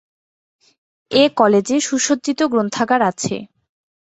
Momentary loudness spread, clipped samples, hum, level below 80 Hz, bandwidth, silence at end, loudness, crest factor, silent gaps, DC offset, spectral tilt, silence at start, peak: 8 LU; under 0.1%; none; -60 dBFS; 8.2 kHz; 0.7 s; -17 LUFS; 18 dB; none; under 0.1%; -3.5 dB/octave; 1.1 s; -2 dBFS